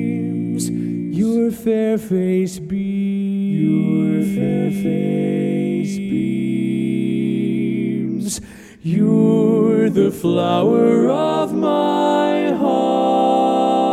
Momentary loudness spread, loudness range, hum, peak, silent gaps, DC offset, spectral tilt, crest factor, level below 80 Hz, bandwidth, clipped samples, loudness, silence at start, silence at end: 7 LU; 4 LU; none; -4 dBFS; none; under 0.1%; -7 dB/octave; 14 dB; -56 dBFS; 14.5 kHz; under 0.1%; -18 LUFS; 0 s; 0 s